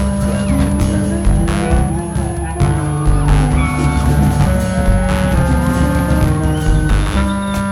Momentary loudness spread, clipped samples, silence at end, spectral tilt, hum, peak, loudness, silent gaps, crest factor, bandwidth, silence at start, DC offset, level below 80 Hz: 3 LU; under 0.1%; 0 s; -6.5 dB/octave; none; 0 dBFS; -15 LUFS; none; 12 dB; 14 kHz; 0 s; under 0.1%; -18 dBFS